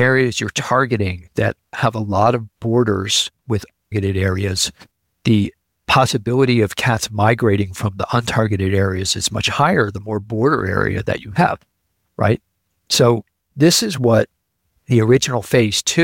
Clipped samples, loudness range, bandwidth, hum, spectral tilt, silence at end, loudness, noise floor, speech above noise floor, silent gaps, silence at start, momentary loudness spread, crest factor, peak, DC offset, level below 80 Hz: under 0.1%; 2 LU; 17 kHz; none; -4.5 dB/octave; 0 s; -18 LUFS; -69 dBFS; 52 dB; none; 0 s; 8 LU; 14 dB; -2 dBFS; under 0.1%; -46 dBFS